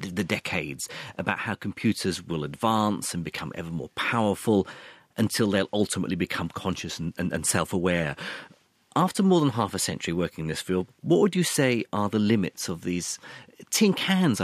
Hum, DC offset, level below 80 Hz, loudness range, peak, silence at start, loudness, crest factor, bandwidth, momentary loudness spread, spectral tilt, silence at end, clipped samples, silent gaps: none; under 0.1%; -58 dBFS; 3 LU; -6 dBFS; 0 s; -26 LUFS; 20 dB; 15.5 kHz; 11 LU; -4.5 dB/octave; 0 s; under 0.1%; none